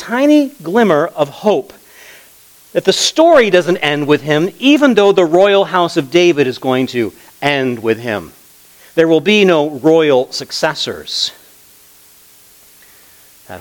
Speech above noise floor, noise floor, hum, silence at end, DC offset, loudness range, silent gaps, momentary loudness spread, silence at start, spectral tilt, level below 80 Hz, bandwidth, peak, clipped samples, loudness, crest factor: 32 dB; -44 dBFS; none; 0 s; under 0.1%; 5 LU; none; 9 LU; 0 s; -4.5 dB/octave; -58 dBFS; 19.5 kHz; 0 dBFS; under 0.1%; -13 LUFS; 14 dB